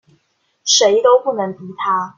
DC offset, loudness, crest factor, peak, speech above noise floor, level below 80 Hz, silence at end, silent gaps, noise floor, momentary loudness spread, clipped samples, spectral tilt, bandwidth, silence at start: under 0.1%; -15 LUFS; 16 dB; 0 dBFS; 49 dB; -66 dBFS; 0.05 s; none; -64 dBFS; 13 LU; under 0.1%; -1.5 dB/octave; 7.4 kHz; 0.65 s